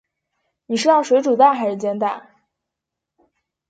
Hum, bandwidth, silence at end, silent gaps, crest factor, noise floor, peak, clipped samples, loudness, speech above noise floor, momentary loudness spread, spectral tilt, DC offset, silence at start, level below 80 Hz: none; 9.2 kHz; 1.5 s; none; 18 dB; -83 dBFS; -2 dBFS; under 0.1%; -17 LUFS; 67 dB; 10 LU; -4.5 dB/octave; under 0.1%; 0.7 s; -74 dBFS